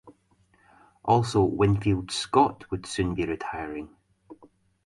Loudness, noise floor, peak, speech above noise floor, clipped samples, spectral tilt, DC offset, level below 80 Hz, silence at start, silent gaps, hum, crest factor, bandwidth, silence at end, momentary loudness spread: -26 LUFS; -64 dBFS; -8 dBFS; 39 dB; under 0.1%; -6 dB/octave; under 0.1%; -48 dBFS; 0.05 s; none; none; 20 dB; 11.5 kHz; 0.4 s; 13 LU